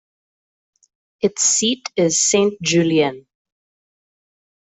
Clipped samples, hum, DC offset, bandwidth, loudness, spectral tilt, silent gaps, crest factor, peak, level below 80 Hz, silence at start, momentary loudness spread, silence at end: under 0.1%; none; under 0.1%; 8.4 kHz; -17 LUFS; -3 dB/octave; none; 18 dB; -4 dBFS; -62 dBFS; 1.25 s; 8 LU; 1.5 s